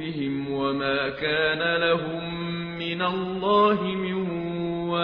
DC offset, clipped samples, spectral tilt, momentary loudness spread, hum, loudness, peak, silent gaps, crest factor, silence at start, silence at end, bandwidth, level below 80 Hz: under 0.1%; under 0.1%; -3.5 dB/octave; 9 LU; none; -25 LUFS; -8 dBFS; none; 16 dB; 0 s; 0 s; 5.4 kHz; -54 dBFS